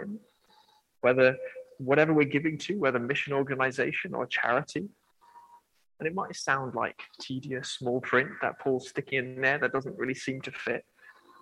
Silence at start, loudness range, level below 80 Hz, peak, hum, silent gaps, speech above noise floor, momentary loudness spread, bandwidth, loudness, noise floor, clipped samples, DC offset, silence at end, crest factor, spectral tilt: 0 s; 6 LU; -72 dBFS; -8 dBFS; none; none; 34 dB; 13 LU; 11.5 kHz; -29 LUFS; -63 dBFS; under 0.1%; under 0.1%; 0.3 s; 22 dB; -5.5 dB/octave